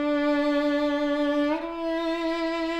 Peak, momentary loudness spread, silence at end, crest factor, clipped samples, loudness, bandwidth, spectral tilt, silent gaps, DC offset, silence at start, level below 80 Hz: -16 dBFS; 4 LU; 0 s; 10 dB; under 0.1%; -26 LUFS; 8.4 kHz; -4 dB/octave; none; under 0.1%; 0 s; -54 dBFS